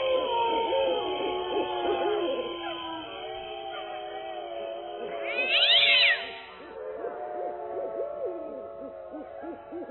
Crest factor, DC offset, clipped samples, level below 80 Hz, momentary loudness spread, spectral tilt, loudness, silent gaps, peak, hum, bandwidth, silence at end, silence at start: 20 dB; under 0.1%; under 0.1%; -64 dBFS; 20 LU; -4.5 dB/octave; -27 LUFS; none; -10 dBFS; none; 4.3 kHz; 0 s; 0 s